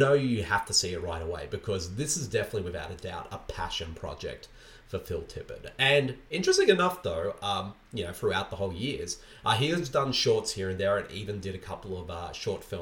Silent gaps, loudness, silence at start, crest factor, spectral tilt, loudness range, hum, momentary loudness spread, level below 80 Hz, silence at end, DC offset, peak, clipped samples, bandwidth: none; -30 LUFS; 0 s; 24 dB; -4 dB/octave; 7 LU; none; 15 LU; -50 dBFS; 0 s; under 0.1%; -6 dBFS; under 0.1%; 19 kHz